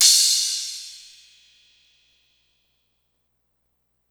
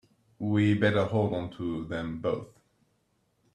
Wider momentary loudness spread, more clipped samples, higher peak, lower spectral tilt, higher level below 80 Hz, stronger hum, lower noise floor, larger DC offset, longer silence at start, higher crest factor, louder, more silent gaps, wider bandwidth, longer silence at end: first, 25 LU vs 11 LU; neither; first, 0 dBFS vs -10 dBFS; second, 7.5 dB/octave vs -8 dB/octave; second, -76 dBFS vs -60 dBFS; first, 60 Hz at -80 dBFS vs none; about the same, -72 dBFS vs -72 dBFS; neither; second, 0 s vs 0.4 s; first, 26 dB vs 20 dB; first, -18 LUFS vs -29 LUFS; neither; first, over 20 kHz vs 9 kHz; first, 3.15 s vs 1.1 s